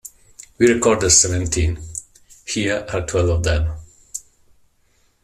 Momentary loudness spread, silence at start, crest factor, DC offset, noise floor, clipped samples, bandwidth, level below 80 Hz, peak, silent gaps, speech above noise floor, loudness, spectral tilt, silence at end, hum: 20 LU; 0.05 s; 20 dB; under 0.1%; -60 dBFS; under 0.1%; 14 kHz; -34 dBFS; -2 dBFS; none; 43 dB; -18 LUFS; -3.5 dB/octave; 1.05 s; none